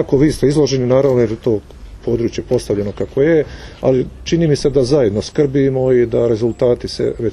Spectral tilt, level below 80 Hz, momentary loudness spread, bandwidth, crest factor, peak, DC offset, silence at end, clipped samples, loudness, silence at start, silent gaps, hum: -7 dB/octave; -36 dBFS; 7 LU; 12 kHz; 14 dB; 0 dBFS; under 0.1%; 0 s; under 0.1%; -15 LUFS; 0 s; none; none